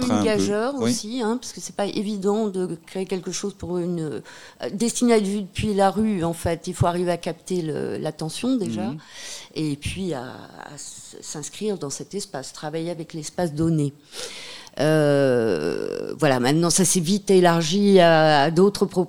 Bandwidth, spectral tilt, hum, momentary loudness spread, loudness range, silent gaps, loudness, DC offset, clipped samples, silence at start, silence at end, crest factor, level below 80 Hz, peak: 17.5 kHz; -5 dB/octave; none; 16 LU; 12 LU; none; -22 LUFS; 0.3%; under 0.1%; 0 s; 0 s; 20 dB; -50 dBFS; -2 dBFS